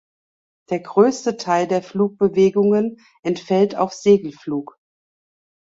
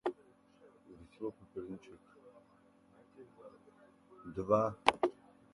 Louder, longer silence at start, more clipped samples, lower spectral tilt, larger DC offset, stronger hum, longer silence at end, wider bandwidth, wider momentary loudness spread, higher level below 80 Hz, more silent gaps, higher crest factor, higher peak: first, -19 LUFS vs -36 LUFS; first, 0.7 s vs 0.05 s; neither; about the same, -6.5 dB/octave vs -5.5 dB/octave; neither; neither; first, 1.15 s vs 0.4 s; second, 7.8 kHz vs 11.5 kHz; second, 11 LU vs 27 LU; first, -62 dBFS vs -70 dBFS; first, 3.19-3.23 s vs none; second, 16 dB vs 32 dB; first, -2 dBFS vs -8 dBFS